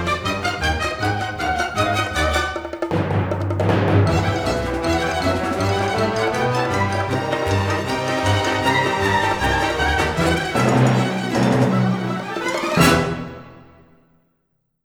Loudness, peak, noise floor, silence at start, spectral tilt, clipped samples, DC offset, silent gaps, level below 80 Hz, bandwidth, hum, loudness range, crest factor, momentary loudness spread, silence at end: -19 LUFS; -2 dBFS; -69 dBFS; 0 s; -5.5 dB/octave; under 0.1%; under 0.1%; none; -36 dBFS; 20 kHz; none; 3 LU; 18 dB; 6 LU; 1.25 s